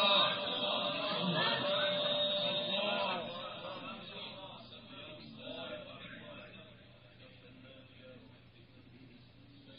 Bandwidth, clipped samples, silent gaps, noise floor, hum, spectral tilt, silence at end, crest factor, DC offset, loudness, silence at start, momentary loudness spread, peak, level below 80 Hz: 5.2 kHz; under 0.1%; none; -59 dBFS; none; -1 dB/octave; 0 s; 22 dB; under 0.1%; -34 LUFS; 0 s; 24 LU; -16 dBFS; -76 dBFS